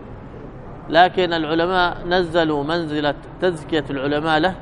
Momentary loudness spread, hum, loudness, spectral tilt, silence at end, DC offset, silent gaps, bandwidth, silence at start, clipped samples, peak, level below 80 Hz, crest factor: 21 LU; none; -19 LUFS; -6 dB/octave; 0 s; under 0.1%; none; 11 kHz; 0 s; under 0.1%; -2 dBFS; -40 dBFS; 18 dB